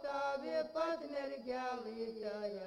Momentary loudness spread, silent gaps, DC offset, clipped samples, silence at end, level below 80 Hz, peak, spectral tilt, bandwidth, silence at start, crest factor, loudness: 5 LU; none; under 0.1%; under 0.1%; 0 s; -74 dBFS; -26 dBFS; -5 dB/octave; 11 kHz; 0 s; 14 dB; -41 LUFS